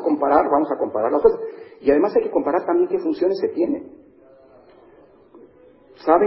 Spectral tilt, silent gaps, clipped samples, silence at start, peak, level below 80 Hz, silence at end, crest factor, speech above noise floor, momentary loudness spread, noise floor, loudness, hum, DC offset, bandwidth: -10.5 dB/octave; none; under 0.1%; 0 s; -2 dBFS; -54 dBFS; 0 s; 20 dB; 31 dB; 7 LU; -50 dBFS; -20 LUFS; none; under 0.1%; 5.8 kHz